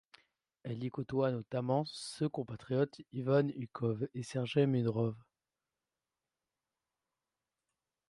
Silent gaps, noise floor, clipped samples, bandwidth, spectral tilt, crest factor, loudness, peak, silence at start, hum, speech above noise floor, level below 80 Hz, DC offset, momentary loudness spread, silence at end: none; under -90 dBFS; under 0.1%; 11.5 kHz; -7 dB/octave; 20 dB; -36 LUFS; -18 dBFS; 0.65 s; none; over 55 dB; -74 dBFS; under 0.1%; 10 LU; 2.9 s